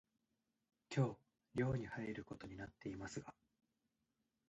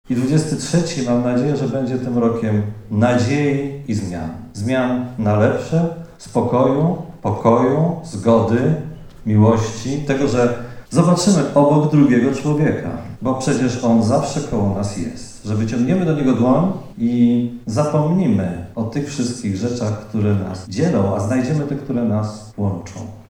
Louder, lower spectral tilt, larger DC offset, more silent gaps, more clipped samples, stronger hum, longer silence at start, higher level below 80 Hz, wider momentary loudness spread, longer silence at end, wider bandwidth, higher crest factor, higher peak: second, -45 LUFS vs -18 LUFS; about the same, -7 dB/octave vs -7 dB/octave; neither; neither; neither; neither; first, 0.9 s vs 0.1 s; second, -70 dBFS vs -44 dBFS; about the same, 12 LU vs 10 LU; first, 1.2 s vs 0.1 s; second, 8.2 kHz vs 11.5 kHz; about the same, 22 dB vs 18 dB; second, -26 dBFS vs 0 dBFS